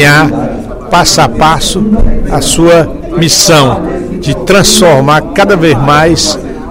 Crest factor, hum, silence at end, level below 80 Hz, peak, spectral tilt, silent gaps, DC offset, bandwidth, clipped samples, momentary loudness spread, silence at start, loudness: 6 dB; none; 0 s; -18 dBFS; 0 dBFS; -4 dB/octave; none; under 0.1%; over 20 kHz; 3%; 10 LU; 0 s; -7 LUFS